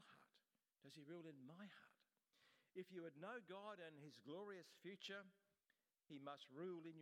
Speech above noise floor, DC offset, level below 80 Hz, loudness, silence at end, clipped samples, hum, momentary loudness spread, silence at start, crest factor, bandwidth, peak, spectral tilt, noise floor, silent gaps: over 32 dB; under 0.1%; under -90 dBFS; -58 LUFS; 0 s; under 0.1%; none; 8 LU; 0 s; 18 dB; 15 kHz; -40 dBFS; -5.5 dB/octave; under -90 dBFS; none